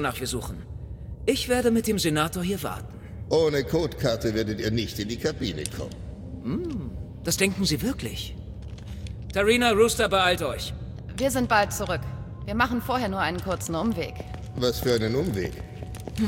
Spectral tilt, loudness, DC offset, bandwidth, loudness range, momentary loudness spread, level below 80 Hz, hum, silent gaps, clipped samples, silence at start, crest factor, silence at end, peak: -4.5 dB/octave; -26 LUFS; under 0.1%; 17 kHz; 5 LU; 16 LU; -42 dBFS; none; none; under 0.1%; 0 s; 18 dB; 0 s; -8 dBFS